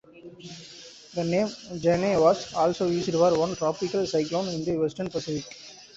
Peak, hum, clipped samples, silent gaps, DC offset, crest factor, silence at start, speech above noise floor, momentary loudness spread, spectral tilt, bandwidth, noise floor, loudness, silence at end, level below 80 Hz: -8 dBFS; none; under 0.1%; none; under 0.1%; 18 dB; 0.15 s; 22 dB; 20 LU; -5.5 dB/octave; 8 kHz; -47 dBFS; -26 LUFS; 0.1 s; -58 dBFS